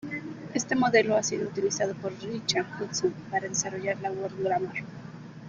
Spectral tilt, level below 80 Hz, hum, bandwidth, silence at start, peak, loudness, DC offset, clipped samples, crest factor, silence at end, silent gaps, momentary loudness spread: -3.5 dB/octave; -66 dBFS; none; 10 kHz; 0 s; -10 dBFS; -29 LUFS; under 0.1%; under 0.1%; 20 dB; 0 s; none; 14 LU